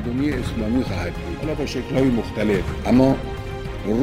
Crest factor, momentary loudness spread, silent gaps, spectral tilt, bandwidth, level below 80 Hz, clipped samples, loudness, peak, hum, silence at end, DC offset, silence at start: 18 dB; 11 LU; none; -7 dB/octave; 15 kHz; -34 dBFS; under 0.1%; -22 LUFS; -2 dBFS; none; 0 s; under 0.1%; 0 s